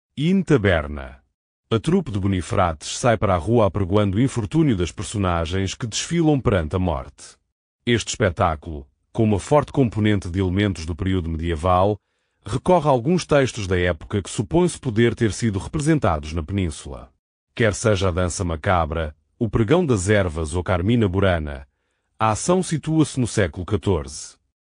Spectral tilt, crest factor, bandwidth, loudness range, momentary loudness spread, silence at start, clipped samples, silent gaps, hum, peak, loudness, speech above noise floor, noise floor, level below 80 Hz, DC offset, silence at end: -6 dB/octave; 18 dB; 10.5 kHz; 2 LU; 10 LU; 0.15 s; under 0.1%; 1.34-1.64 s, 7.52-7.79 s, 17.19-17.47 s; none; -4 dBFS; -21 LUFS; 50 dB; -71 dBFS; -38 dBFS; under 0.1%; 0.45 s